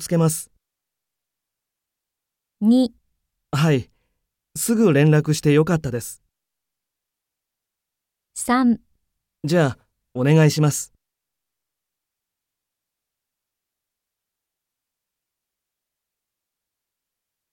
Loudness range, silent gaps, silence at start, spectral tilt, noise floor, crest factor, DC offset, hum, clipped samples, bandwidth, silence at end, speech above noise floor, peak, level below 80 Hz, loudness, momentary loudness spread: 6 LU; none; 0 s; -6 dB/octave; -84 dBFS; 20 dB; under 0.1%; none; under 0.1%; 17 kHz; 6.65 s; 67 dB; -4 dBFS; -58 dBFS; -19 LUFS; 16 LU